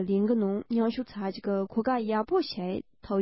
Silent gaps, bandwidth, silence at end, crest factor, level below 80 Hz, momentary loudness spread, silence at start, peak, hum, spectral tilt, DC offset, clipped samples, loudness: none; 5.8 kHz; 0 s; 14 dB; -62 dBFS; 8 LU; 0 s; -14 dBFS; none; -10.5 dB/octave; under 0.1%; under 0.1%; -29 LUFS